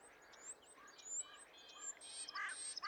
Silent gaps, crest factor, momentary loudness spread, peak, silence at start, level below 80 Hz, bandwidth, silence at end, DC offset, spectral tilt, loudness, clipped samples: none; 16 dB; 13 LU; -34 dBFS; 0 s; -88 dBFS; 19 kHz; 0 s; under 0.1%; 2.5 dB/octave; -48 LUFS; under 0.1%